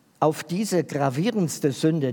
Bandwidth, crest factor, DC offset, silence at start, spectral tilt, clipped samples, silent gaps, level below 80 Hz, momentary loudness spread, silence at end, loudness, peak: 18 kHz; 18 dB; under 0.1%; 0.2 s; -6 dB/octave; under 0.1%; none; -74 dBFS; 2 LU; 0 s; -24 LUFS; -6 dBFS